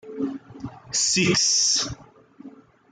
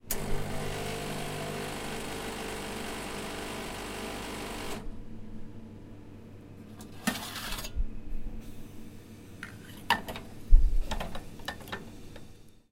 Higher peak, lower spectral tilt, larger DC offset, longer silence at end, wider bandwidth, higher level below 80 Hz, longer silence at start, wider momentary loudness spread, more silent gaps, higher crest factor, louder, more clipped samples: about the same, -8 dBFS vs -6 dBFS; second, -2 dB/octave vs -4 dB/octave; neither; first, 0.4 s vs 0.2 s; second, 11 kHz vs 16 kHz; second, -56 dBFS vs -34 dBFS; about the same, 0.05 s vs 0.05 s; first, 22 LU vs 18 LU; neither; second, 16 dB vs 26 dB; first, -20 LUFS vs -36 LUFS; neither